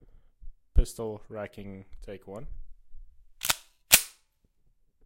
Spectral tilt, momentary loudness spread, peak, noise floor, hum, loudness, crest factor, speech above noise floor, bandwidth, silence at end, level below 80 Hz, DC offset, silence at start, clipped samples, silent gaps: -1.5 dB/octave; 25 LU; -2 dBFS; -68 dBFS; none; -27 LUFS; 30 dB; 29 dB; 16.5 kHz; 0.95 s; -36 dBFS; under 0.1%; 0.45 s; under 0.1%; none